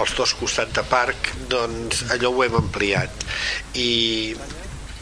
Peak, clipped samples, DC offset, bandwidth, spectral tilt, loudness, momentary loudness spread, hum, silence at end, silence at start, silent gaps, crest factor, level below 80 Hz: -4 dBFS; under 0.1%; under 0.1%; 11 kHz; -3 dB/octave; -21 LUFS; 8 LU; none; 0 s; 0 s; none; 18 dB; -38 dBFS